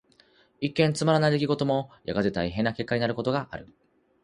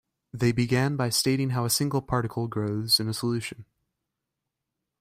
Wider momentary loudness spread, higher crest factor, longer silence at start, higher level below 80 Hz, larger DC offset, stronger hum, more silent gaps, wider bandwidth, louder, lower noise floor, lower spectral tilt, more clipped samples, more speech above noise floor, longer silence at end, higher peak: about the same, 9 LU vs 7 LU; about the same, 20 dB vs 20 dB; first, 0.6 s vs 0.35 s; about the same, -54 dBFS vs -56 dBFS; neither; neither; neither; second, 11 kHz vs 16 kHz; about the same, -26 LUFS vs -26 LUFS; second, -61 dBFS vs -85 dBFS; first, -6 dB/octave vs -4.5 dB/octave; neither; second, 35 dB vs 59 dB; second, 0.6 s vs 1.4 s; about the same, -8 dBFS vs -8 dBFS